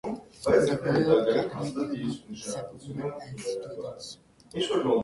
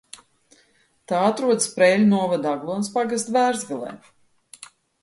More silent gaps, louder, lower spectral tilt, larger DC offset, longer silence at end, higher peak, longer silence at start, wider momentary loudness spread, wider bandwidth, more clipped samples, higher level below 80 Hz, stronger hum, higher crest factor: neither; second, -29 LUFS vs -21 LUFS; about the same, -5.5 dB/octave vs -4.5 dB/octave; neither; second, 0 s vs 0.35 s; second, -10 dBFS vs -2 dBFS; second, 0.05 s vs 1.1 s; about the same, 16 LU vs 18 LU; about the same, 11.5 kHz vs 11.5 kHz; neither; first, -58 dBFS vs -70 dBFS; neither; about the same, 20 dB vs 20 dB